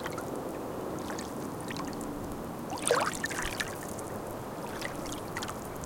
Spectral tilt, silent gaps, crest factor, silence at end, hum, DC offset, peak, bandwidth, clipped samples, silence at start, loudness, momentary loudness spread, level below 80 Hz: -3.5 dB/octave; none; 26 dB; 0 s; none; under 0.1%; -8 dBFS; 17 kHz; under 0.1%; 0 s; -35 LUFS; 10 LU; -52 dBFS